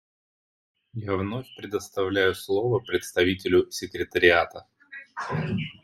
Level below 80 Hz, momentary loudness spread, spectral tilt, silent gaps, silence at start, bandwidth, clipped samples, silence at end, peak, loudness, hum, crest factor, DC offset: -60 dBFS; 16 LU; -5 dB/octave; none; 0.95 s; 14 kHz; under 0.1%; 0.1 s; -4 dBFS; -25 LUFS; none; 22 dB; under 0.1%